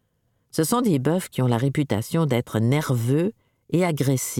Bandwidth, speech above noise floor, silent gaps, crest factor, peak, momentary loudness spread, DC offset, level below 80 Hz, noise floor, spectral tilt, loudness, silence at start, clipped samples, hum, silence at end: 18 kHz; 48 dB; none; 14 dB; -8 dBFS; 4 LU; under 0.1%; -58 dBFS; -69 dBFS; -6 dB/octave; -23 LUFS; 0.55 s; under 0.1%; none; 0 s